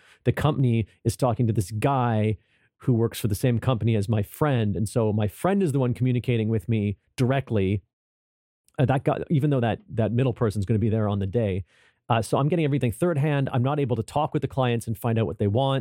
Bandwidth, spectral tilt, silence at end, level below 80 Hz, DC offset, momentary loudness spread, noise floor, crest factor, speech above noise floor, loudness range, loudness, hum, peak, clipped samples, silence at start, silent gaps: 16.5 kHz; -7.5 dB/octave; 0 s; -52 dBFS; under 0.1%; 4 LU; under -90 dBFS; 16 dB; over 67 dB; 2 LU; -25 LUFS; none; -8 dBFS; under 0.1%; 0.25 s; 7.93-8.64 s